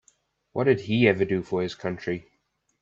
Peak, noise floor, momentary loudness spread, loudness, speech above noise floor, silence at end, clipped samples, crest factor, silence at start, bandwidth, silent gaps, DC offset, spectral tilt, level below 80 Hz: -4 dBFS; -73 dBFS; 12 LU; -25 LUFS; 48 dB; 0.6 s; under 0.1%; 22 dB; 0.55 s; 7.6 kHz; none; under 0.1%; -7 dB/octave; -62 dBFS